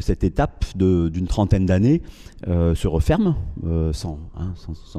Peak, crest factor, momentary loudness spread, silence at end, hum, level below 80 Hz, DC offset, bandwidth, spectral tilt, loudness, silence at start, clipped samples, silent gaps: -6 dBFS; 16 dB; 13 LU; 0 s; none; -30 dBFS; under 0.1%; 12.5 kHz; -8 dB/octave; -21 LUFS; 0 s; under 0.1%; none